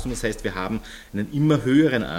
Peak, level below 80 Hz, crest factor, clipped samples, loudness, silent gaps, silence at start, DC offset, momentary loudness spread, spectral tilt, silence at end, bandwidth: -6 dBFS; -40 dBFS; 16 dB; under 0.1%; -23 LUFS; none; 0 s; under 0.1%; 13 LU; -6.5 dB/octave; 0 s; 16 kHz